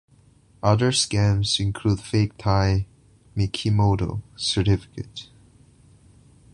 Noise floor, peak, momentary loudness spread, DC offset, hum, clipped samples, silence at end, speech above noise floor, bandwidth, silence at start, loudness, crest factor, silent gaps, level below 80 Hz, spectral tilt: -55 dBFS; -4 dBFS; 15 LU; under 0.1%; none; under 0.1%; 1.3 s; 34 dB; 11 kHz; 0.65 s; -22 LUFS; 20 dB; none; -40 dBFS; -5 dB/octave